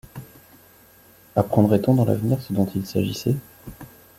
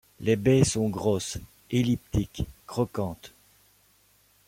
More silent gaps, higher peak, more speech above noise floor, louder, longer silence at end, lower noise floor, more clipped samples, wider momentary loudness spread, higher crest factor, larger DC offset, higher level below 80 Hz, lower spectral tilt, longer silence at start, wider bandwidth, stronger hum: neither; first, -2 dBFS vs -8 dBFS; second, 32 dB vs 37 dB; first, -22 LUFS vs -27 LUFS; second, 0.3 s vs 1.2 s; second, -52 dBFS vs -63 dBFS; neither; first, 23 LU vs 13 LU; about the same, 20 dB vs 20 dB; neither; second, -54 dBFS vs -46 dBFS; first, -8 dB/octave vs -6 dB/octave; about the same, 0.15 s vs 0.2 s; about the same, 16.5 kHz vs 16.5 kHz; neither